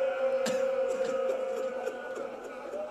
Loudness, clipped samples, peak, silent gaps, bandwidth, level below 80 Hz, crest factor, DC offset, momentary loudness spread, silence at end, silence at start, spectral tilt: -32 LUFS; under 0.1%; -14 dBFS; none; 13 kHz; -72 dBFS; 16 dB; under 0.1%; 10 LU; 0 s; 0 s; -3.5 dB/octave